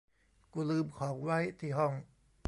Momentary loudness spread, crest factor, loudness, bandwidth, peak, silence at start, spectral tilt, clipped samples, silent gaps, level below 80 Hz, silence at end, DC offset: 7 LU; 18 dB; -36 LUFS; 11.5 kHz; -18 dBFS; 0.55 s; -7.5 dB/octave; under 0.1%; none; -68 dBFS; 0.45 s; under 0.1%